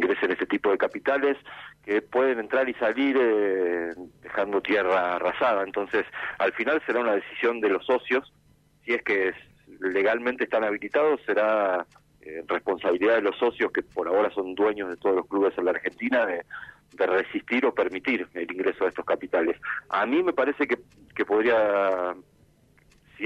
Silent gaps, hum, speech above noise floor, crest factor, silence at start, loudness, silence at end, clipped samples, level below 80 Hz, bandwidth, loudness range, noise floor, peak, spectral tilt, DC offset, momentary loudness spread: none; none; 35 dB; 16 dB; 0 s; -25 LUFS; 0 s; under 0.1%; -66 dBFS; 7.6 kHz; 2 LU; -61 dBFS; -10 dBFS; -6 dB/octave; under 0.1%; 9 LU